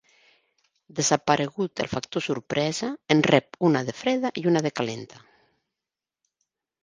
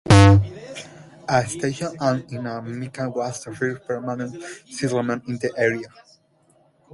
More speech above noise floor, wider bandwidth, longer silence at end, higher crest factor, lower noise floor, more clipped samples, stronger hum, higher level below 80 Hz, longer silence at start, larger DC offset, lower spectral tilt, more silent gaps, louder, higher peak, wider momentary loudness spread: first, 64 dB vs 35 dB; about the same, 10.5 kHz vs 11.5 kHz; first, 1.65 s vs 1.05 s; about the same, 26 dB vs 22 dB; first, -89 dBFS vs -60 dBFS; neither; neither; second, -64 dBFS vs -38 dBFS; first, 0.95 s vs 0.05 s; neither; second, -4.5 dB/octave vs -6 dB/octave; neither; second, -25 LUFS vs -22 LUFS; about the same, -2 dBFS vs 0 dBFS; second, 9 LU vs 18 LU